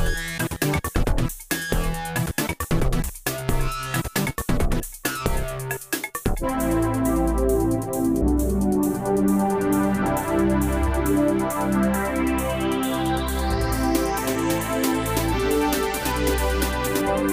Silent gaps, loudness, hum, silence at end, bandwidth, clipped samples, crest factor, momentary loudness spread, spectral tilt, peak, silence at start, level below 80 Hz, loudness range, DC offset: none; -23 LUFS; none; 0 s; 16 kHz; under 0.1%; 18 dB; 5 LU; -5 dB/octave; -4 dBFS; 0 s; -30 dBFS; 4 LU; under 0.1%